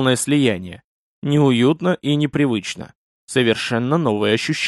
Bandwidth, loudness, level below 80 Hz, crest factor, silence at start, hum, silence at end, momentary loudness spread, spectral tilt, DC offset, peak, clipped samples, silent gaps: 12.5 kHz; -18 LUFS; -58 dBFS; 16 dB; 0 s; none; 0 s; 12 LU; -5.5 dB/octave; under 0.1%; -2 dBFS; under 0.1%; 0.84-1.22 s, 2.95-3.28 s